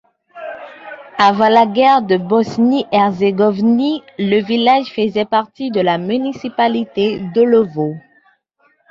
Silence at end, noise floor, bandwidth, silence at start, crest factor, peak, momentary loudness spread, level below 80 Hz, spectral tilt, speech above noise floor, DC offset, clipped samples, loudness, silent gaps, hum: 0.9 s; -59 dBFS; 7.4 kHz; 0.35 s; 14 dB; 0 dBFS; 16 LU; -58 dBFS; -7 dB/octave; 45 dB; under 0.1%; under 0.1%; -15 LUFS; none; none